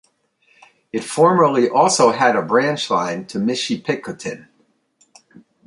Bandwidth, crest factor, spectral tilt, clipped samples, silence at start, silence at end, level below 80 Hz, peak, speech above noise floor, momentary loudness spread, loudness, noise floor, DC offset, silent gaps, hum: 11.5 kHz; 18 dB; -4 dB/octave; under 0.1%; 0.95 s; 1.3 s; -66 dBFS; -2 dBFS; 45 dB; 15 LU; -17 LUFS; -62 dBFS; under 0.1%; none; none